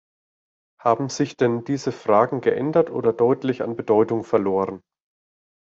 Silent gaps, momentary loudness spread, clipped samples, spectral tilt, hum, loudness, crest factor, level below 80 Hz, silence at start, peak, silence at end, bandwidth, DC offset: none; 7 LU; under 0.1%; -6.5 dB/octave; none; -22 LUFS; 20 dB; -64 dBFS; 0.85 s; -4 dBFS; 1 s; 7.8 kHz; under 0.1%